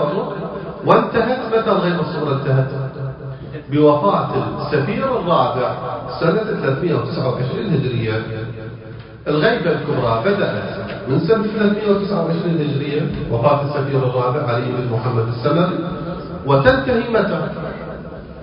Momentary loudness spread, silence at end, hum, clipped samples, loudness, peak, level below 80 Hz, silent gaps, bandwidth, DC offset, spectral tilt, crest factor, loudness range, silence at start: 12 LU; 0 s; none; under 0.1%; -18 LUFS; 0 dBFS; -42 dBFS; none; 5.4 kHz; under 0.1%; -10 dB/octave; 18 dB; 2 LU; 0 s